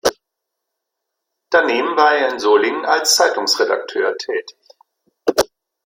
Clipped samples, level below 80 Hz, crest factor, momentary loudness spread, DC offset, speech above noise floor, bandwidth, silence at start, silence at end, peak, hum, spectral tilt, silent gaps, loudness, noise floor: under 0.1%; -58 dBFS; 18 dB; 10 LU; under 0.1%; 63 dB; 16.5 kHz; 0.05 s; 0.4 s; 0 dBFS; none; -0.5 dB/octave; none; -16 LUFS; -79 dBFS